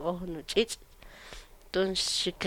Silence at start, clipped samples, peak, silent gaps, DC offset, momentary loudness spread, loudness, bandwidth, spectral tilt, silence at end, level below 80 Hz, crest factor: 0 s; under 0.1%; -12 dBFS; none; under 0.1%; 21 LU; -30 LUFS; 18.5 kHz; -3 dB/octave; 0 s; -52 dBFS; 20 dB